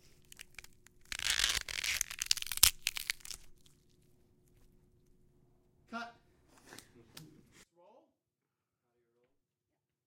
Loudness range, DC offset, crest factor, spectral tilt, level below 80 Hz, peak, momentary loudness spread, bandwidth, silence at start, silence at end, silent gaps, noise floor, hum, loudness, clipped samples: 21 LU; under 0.1%; 38 dB; 1 dB/octave; -58 dBFS; -4 dBFS; 28 LU; 17 kHz; 0.65 s; 2.45 s; none; -89 dBFS; none; -32 LUFS; under 0.1%